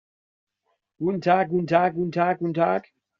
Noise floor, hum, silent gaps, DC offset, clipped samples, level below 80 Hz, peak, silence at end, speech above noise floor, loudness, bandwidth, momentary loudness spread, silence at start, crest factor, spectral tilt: -75 dBFS; none; none; under 0.1%; under 0.1%; -64 dBFS; -4 dBFS; 0.4 s; 53 dB; -23 LUFS; 7.2 kHz; 7 LU; 1 s; 20 dB; -6 dB/octave